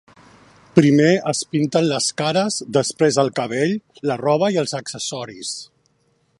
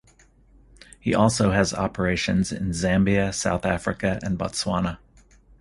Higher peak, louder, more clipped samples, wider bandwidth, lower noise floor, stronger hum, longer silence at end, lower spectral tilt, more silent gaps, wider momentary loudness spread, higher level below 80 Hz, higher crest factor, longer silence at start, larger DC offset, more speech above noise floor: first, 0 dBFS vs -4 dBFS; first, -19 LUFS vs -23 LUFS; neither; about the same, 11.5 kHz vs 11.5 kHz; first, -63 dBFS vs -56 dBFS; neither; about the same, 0.75 s vs 0.65 s; about the same, -4.5 dB/octave vs -5 dB/octave; neither; first, 12 LU vs 7 LU; second, -64 dBFS vs -42 dBFS; about the same, 20 dB vs 20 dB; second, 0.75 s vs 1.05 s; neither; first, 45 dB vs 33 dB